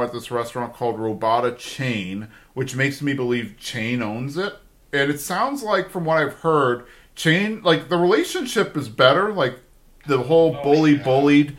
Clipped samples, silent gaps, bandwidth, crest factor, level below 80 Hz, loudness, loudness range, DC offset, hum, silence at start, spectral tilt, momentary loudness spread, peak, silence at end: under 0.1%; none; 16 kHz; 20 dB; -54 dBFS; -21 LUFS; 6 LU; under 0.1%; none; 0 s; -5.5 dB/octave; 11 LU; 0 dBFS; 0 s